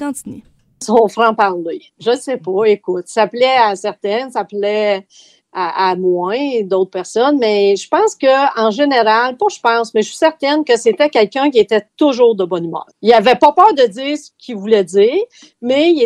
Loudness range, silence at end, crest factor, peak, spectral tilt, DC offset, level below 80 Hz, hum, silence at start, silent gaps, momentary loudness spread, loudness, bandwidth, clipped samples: 4 LU; 0 s; 14 dB; 0 dBFS; -4 dB/octave; under 0.1%; -62 dBFS; none; 0 s; none; 11 LU; -14 LUFS; 12.5 kHz; under 0.1%